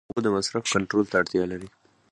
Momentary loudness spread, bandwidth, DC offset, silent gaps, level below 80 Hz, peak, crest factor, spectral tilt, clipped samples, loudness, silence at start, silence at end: 6 LU; 11.5 kHz; under 0.1%; none; -56 dBFS; -8 dBFS; 18 dB; -4 dB/octave; under 0.1%; -25 LUFS; 0.15 s; 0.45 s